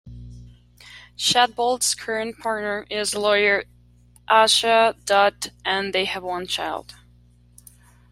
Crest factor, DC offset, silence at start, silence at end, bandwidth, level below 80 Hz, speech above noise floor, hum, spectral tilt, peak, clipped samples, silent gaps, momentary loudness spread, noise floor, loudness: 20 dB; under 0.1%; 0.05 s; 1.3 s; 16 kHz; -52 dBFS; 32 dB; 60 Hz at -50 dBFS; -1.5 dB/octave; -2 dBFS; under 0.1%; none; 13 LU; -53 dBFS; -20 LUFS